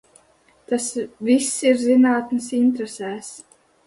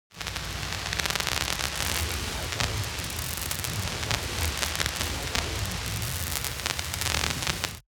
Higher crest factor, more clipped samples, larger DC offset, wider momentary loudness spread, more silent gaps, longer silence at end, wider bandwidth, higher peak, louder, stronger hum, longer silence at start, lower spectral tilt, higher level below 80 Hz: second, 16 dB vs 26 dB; neither; neither; first, 14 LU vs 5 LU; neither; first, 0.5 s vs 0.1 s; second, 11.5 kHz vs over 20 kHz; about the same, -6 dBFS vs -4 dBFS; first, -20 LUFS vs -29 LUFS; neither; first, 0.7 s vs 0.1 s; first, -3.5 dB/octave vs -2 dB/octave; second, -64 dBFS vs -40 dBFS